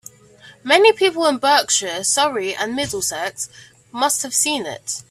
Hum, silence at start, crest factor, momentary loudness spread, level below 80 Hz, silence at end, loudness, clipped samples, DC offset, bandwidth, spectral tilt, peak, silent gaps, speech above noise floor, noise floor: none; 0.45 s; 20 dB; 14 LU; -60 dBFS; 0.1 s; -18 LUFS; under 0.1%; under 0.1%; 16 kHz; -1 dB/octave; 0 dBFS; none; 28 dB; -46 dBFS